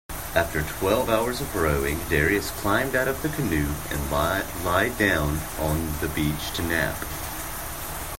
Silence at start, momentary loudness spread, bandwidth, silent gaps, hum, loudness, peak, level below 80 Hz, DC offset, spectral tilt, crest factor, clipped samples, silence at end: 0.1 s; 9 LU; 16.5 kHz; none; none; -25 LUFS; -6 dBFS; -38 dBFS; under 0.1%; -4.5 dB/octave; 20 dB; under 0.1%; 0 s